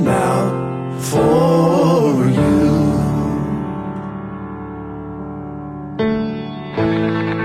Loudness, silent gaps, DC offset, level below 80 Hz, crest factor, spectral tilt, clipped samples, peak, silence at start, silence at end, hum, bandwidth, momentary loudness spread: -17 LUFS; none; under 0.1%; -38 dBFS; 14 dB; -7 dB/octave; under 0.1%; -4 dBFS; 0 s; 0 s; none; 15 kHz; 15 LU